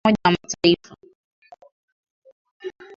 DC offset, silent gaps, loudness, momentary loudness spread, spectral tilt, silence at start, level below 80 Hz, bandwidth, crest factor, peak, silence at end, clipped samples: under 0.1%; 1.15-1.42 s, 1.72-2.04 s, 2.10-2.22 s, 2.32-2.45 s, 2.51-2.60 s; -20 LUFS; 19 LU; -4.5 dB/octave; 0.05 s; -56 dBFS; 7.6 kHz; 22 dB; -2 dBFS; 0.25 s; under 0.1%